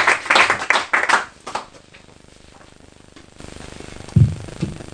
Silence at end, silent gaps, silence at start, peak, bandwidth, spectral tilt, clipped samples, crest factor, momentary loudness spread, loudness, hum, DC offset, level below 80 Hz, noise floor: 0.05 s; none; 0 s; 0 dBFS; 10.5 kHz; -4 dB/octave; under 0.1%; 22 dB; 22 LU; -17 LUFS; 50 Hz at -50 dBFS; under 0.1%; -40 dBFS; -46 dBFS